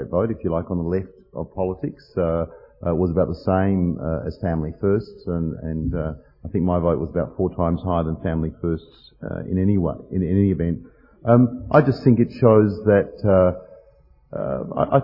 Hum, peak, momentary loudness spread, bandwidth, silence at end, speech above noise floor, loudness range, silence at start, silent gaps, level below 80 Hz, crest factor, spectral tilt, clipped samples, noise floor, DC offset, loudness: none; -2 dBFS; 13 LU; 5.8 kHz; 0 s; 33 dB; 6 LU; 0 s; none; -42 dBFS; 20 dB; -11.5 dB/octave; under 0.1%; -54 dBFS; under 0.1%; -21 LUFS